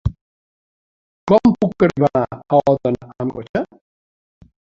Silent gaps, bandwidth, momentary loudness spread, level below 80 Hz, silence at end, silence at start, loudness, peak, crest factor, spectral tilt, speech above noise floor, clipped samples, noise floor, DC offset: 0.21-1.27 s, 3.49-3.54 s; 7.4 kHz; 12 LU; -40 dBFS; 1.05 s; 0.05 s; -18 LUFS; -2 dBFS; 18 dB; -8.5 dB/octave; over 72 dB; under 0.1%; under -90 dBFS; under 0.1%